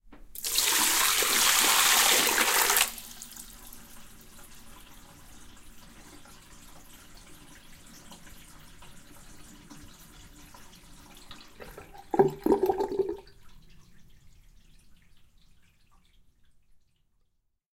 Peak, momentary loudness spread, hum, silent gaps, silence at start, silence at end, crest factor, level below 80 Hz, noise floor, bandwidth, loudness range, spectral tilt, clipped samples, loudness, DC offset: -6 dBFS; 28 LU; none; none; 0.1 s; 3.75 s; 26 dB; -56 dBFS; -73 dBFS; 17 kHz; 27 LU; -0.5 dB/octave; under 0.1%; -23 LUFS; under 0.1%